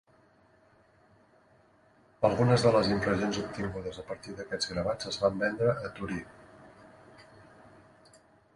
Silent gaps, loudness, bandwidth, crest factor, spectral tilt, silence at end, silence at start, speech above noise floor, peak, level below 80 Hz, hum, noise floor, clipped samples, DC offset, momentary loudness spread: none; -30 LUFS; 11.5 kHz; 22 dB; -5.5 dB/octave; 1.35 s; 2.2 s; 34 dB; -10 dBFS; -56 dBFS; none; -63 dBFS; under 0.1%; under 0.1%; 15 LU